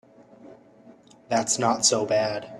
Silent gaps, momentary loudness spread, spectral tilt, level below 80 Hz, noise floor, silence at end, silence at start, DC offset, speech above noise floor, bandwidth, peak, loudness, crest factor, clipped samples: none; 6 LU; -2.5 dB/octave; -68 dBFS; -52 dBFS; 0 s; 0.45 s; under 0.1%; 28 dB; 14 kHz; -6 dBFS; -23 LUFS; 20 dB; under 0.1%